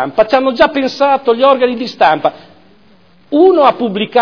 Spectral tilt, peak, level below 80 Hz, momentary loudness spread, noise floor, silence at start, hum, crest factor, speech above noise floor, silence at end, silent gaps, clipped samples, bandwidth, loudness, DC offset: -5.5 dB/octave; 0 dBFS; -50 dBFS; 7 LU; -48 dBFS; 0 s; none; 12 dB; 37 dB; 0 s; none; 0.3%; 5.4 kHz; -11 LUFS; 0.4%